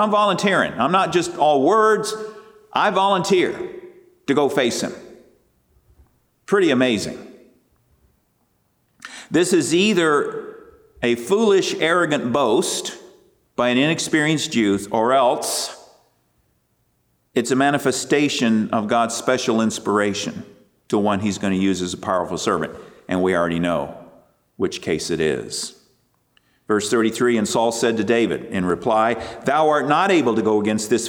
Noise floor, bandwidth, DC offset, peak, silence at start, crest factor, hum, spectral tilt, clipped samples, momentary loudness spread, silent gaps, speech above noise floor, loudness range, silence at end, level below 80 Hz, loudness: -66 dBFS; 19.5 kHz; under 0.1%; -6 dBFS; 0 s; 16 dB; none; -4 dB/octave; under 0.1%; 11 LU; none; 47 dB; 5 LU; 0 s; -58 dBFS; -19 LUFS